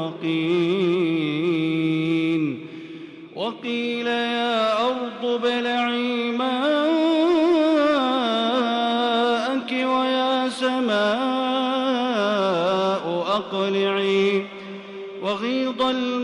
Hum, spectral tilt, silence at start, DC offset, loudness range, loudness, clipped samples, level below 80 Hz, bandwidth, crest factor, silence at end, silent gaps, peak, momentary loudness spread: none; -5.5 dB/octave; 0 s; under 0.1%; 4 LU; -22 LUFS; under 0.1%; -68 dBFS; 11 kHz; 12 dB; 0 s; none; -10 dBFS; 8 LU